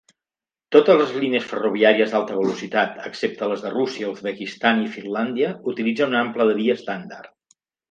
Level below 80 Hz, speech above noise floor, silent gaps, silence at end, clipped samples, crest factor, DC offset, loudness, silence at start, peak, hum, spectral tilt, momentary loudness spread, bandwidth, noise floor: -72 dBFS; over 69 dB; none; 0.65 s; under 0.1%; 20 dB; under 0.1%; -21 LUFS; 0.7 s; 0 dBFS; none; -5.5 dB/octave; 11 LU; 7.6 kHz; under -90 dBFS